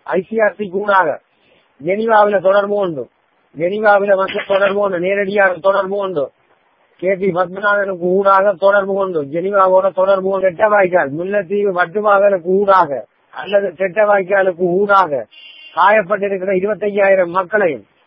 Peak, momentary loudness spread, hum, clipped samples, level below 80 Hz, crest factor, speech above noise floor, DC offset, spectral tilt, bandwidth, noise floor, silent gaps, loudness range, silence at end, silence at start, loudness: 0 dBFS; 9 LU; none; under 0.1%; -62 dBFS; 14 dB; 42 dB; under 0.1%; -8.5 dB/octave; 5.6 kHz; -56 dBFS; none; 2 LU; 0.25 s; 0.05 s; -14 LUFS